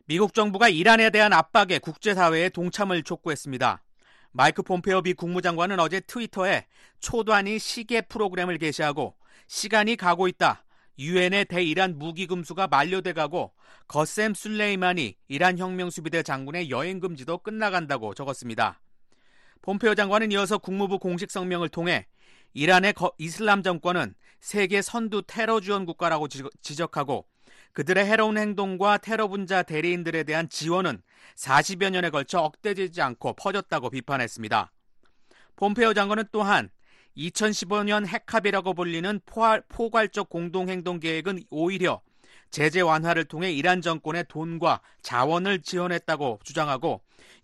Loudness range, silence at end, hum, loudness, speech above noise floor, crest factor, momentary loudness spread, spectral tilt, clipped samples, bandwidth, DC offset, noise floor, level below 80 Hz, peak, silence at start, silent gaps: 3 LU; 0.45 s; none; -25 LUFS; 32 dB; 20 dB; 10 LU; -4.5 dB/octave; under 0.1%; 12.5 kHz; under 0.1%; -58 dBFS; -62 dBFS; -6 dBFS; 0.1 s; none